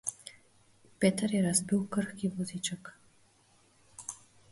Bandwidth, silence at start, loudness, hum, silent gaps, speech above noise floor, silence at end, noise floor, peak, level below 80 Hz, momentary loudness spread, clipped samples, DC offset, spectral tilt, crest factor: 11.5 kHz; 0.05 s; -32 LUFS; none; none; 35 dB; 0.35 s; -66 dBFS; -12 dBFS; -68 dBFS; 22 LU; under 0.1%; under 0.1%; -4.5 dB/octave; 22 dB